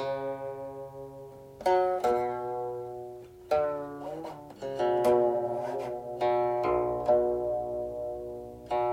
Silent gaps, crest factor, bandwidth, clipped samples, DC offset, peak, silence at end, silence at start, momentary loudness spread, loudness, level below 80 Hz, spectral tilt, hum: none; 16 dB; 15.5 kHz; under 0.1%; under 0.1%; -14 dBFS; 0 s; 0 s; 16 LU; -30 LUFS; -58 dBFS; -6.5 dB/octave; none